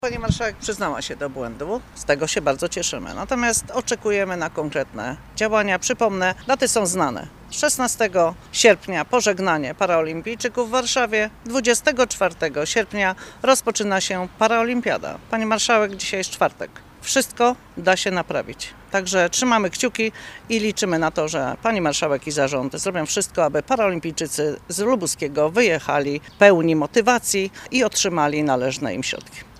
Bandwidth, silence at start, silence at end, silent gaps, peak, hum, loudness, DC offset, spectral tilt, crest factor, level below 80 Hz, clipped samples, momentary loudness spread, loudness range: 15.5 kHz; 0.05 s; 0.15 s; none; 0 dBFS; none; -21 LUFS; under 0.1%; -3 dB/octave; 22 dB; -48 dBFS; under 0.1%; 8 LU; 4 LU